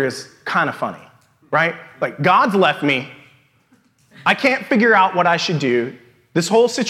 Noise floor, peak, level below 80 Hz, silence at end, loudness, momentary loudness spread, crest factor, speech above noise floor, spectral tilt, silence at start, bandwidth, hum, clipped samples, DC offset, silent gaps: -57 dBFS; 0 dBFS; -70 dBFS; 0 s; -17 LUFS; 12 LU; 18 dB; 40 dB; -4.5 dB/octave; 0 s; 15 kHz; none; under 0.1%; under 0.1%; none